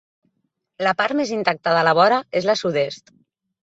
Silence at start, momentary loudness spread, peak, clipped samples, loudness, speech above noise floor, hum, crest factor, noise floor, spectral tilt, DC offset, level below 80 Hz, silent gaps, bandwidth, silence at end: 0.8 s; 8 LU; -2 dBFS; under 0.1%; -19 LUFS; 54 dB; none; 20 dB; -73 dBFS; -4.5 dB/octave; under 0.1%; -66 dBFS; none; 8 kHz; 0.65 s